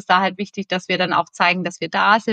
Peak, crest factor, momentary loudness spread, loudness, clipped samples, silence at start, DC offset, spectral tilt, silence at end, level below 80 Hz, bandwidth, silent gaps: 0 dBFS; 18 dB; 8 LU; -19 LUFS; under 0.1%; 0.1 s; under 0.1%; -4.5 dB/octave; 0 s; -72 dBFS; 9.2 kHz; none